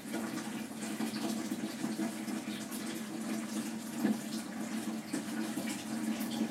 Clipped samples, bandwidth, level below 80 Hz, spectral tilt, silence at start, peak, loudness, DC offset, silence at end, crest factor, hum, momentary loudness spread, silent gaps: under 0.1%; 16 kHz; -80 dBFS; -4 dB/octave; 0 s; -18 dBFS; -38 LUFS; under 0.1%; 0 s; 18 dB; none; 4 LU; none